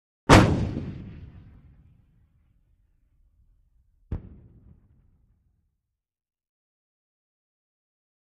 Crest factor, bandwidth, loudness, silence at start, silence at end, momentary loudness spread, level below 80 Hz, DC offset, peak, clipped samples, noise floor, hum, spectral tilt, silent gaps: 26 dB; 10.5 kHz; -20 LUFS; 0.3 s; 4.1 s; 26 LU; -40 dBFS; under 0.1%; -2 dBFS; under 0.1%; -81 dBFS; none; -5.5 dB/octave; none